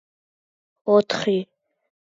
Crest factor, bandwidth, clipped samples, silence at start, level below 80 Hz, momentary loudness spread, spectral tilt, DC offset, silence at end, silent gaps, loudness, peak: 20 dB; 7.6 kHz; under 0.1%; 0.85 s; -72 dBFS; 14 LU; -5.5 dB/octave; under 0.1%; 0.75 s; none; -21 LUFS; -6 dBFS